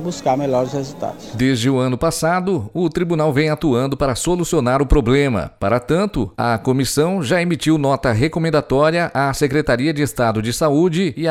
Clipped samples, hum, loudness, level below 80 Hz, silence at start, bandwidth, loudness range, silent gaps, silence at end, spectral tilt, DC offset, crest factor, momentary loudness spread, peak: under 0.1%; none; -18 LUFS; -32 dBFS; 0 s; 16 kHz; 1 LU; none; 0 s; -5.5 dB/octave; under 0.1%; 14 dB; 4 LU; -2 dBFS